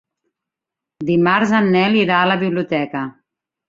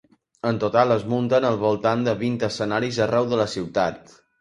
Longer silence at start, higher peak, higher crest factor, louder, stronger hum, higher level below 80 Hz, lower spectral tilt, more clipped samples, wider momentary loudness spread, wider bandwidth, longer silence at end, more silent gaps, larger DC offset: first, 1 s vs 0.45 s; about the same, -2 dBFS vs -2 dBFS; about the same, 16 dB vs 20 dB; first, -16 LUFS vs -22 LUFS; neither; about the same, -60 dBFS vs -56 dBFS; about the same, -6.5 dB/octave vs -6 dB/octave; neither; first, 12 LU vs 5 LU; second, 7.6 kHz vs 11.5 kHz; first, 0.6 s vs 0.4 s; neither; neither